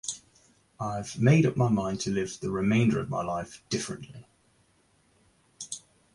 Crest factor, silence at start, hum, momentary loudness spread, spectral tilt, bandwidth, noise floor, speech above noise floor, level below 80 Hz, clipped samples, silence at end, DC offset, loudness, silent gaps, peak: 20 dB; 0.05 s; none; 18 LU; -6 dB/octave; 11.5 kHz; -66 dBFS; 39 dB; -58 dBFS; under 0.1%; 0.35 s; under 0.1%; -28 LUFS; none; -8 dBFS